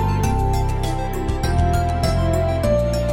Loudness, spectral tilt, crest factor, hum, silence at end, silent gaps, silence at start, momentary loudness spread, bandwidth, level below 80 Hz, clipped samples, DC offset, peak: -20 LUFS; -6.5 dB/octave; 12 dB; none; 0 s; none; 0 s; 5 LU; 16.5 kHz; -24 dBFS; under 0.1%; under 0.1%; -6 dBFS